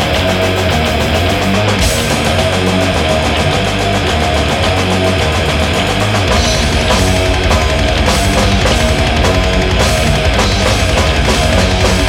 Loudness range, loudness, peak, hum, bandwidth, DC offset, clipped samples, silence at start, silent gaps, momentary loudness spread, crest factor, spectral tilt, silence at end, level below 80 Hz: 1 LU; -12 LUFS; 0 dBFS; none; 17 kHz; under 0.1%; under 0.1%; 0 s; none; 2 LU; 12 dB; -4.5 dB/octave; 0 s; -18 dBFS